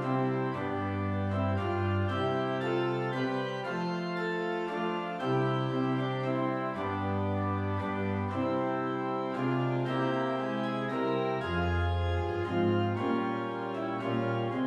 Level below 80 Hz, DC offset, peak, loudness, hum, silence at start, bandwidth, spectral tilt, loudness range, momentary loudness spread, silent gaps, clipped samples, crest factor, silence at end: -52 dBFS; under 0.1%; -16 dBFS; -31 LUFS; none; 0 s; 8.6 kHz; -8 dB/octave; 1 LU; 3 LU; none; under 0.1%; 14 dB; 0 s